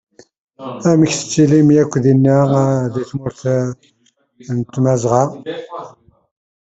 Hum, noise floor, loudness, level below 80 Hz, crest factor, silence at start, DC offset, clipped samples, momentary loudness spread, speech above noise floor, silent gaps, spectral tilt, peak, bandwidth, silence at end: none; -40 dBFS; -15 LUFS; -52 dBFS; 14 dB; 0.6 s; under 0.1%; under 0.1%; 17 LU; 25 dB; none; -7 dB/octave; -2 dBFS; 8.2 kHz; 0.9 s